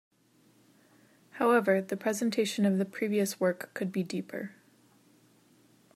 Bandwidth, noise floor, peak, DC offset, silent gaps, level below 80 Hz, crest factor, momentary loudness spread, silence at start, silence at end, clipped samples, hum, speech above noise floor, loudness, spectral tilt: 15.5 kHz; -65 dBFS; -12 dBFS; under 0.1%; none; -82 dBFS; 20 dB; 13 LU; 1.35 s; 1.45 s; under 0.1%; none; 36 dB; -30 LUFS; -5.5 dB/octave